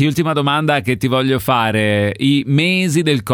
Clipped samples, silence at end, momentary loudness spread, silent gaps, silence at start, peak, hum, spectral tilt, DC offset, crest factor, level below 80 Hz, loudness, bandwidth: under 0.1%; 0 s; 2 LU; none; 0 s; -4 dBFS; none; -5.5 dB/octave; under 0.1%; 12 dB; -50 dBFS; -15 LUFS; 19.5 kHz